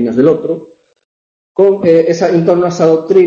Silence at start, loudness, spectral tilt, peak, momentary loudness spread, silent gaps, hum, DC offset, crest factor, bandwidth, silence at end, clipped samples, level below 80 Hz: 0 s; -11 LUFS; -7.5 dB/octave; 0 dBFS; 10 LU; 1.05-1.55 s; none; under 0.1%; 10 dB; 7.4 kHz; 0 s; under 0.1%; -54 dBFS